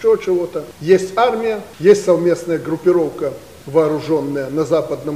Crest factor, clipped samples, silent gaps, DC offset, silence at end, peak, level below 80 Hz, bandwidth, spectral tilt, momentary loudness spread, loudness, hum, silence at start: 16 dB; under 0.1%; none; 0.2%; 0 s; 0 dBFS; -54 dBFS; 15.5 kHz; -6 dB/octave; 10 LU; -17 LUFS; none; 0 s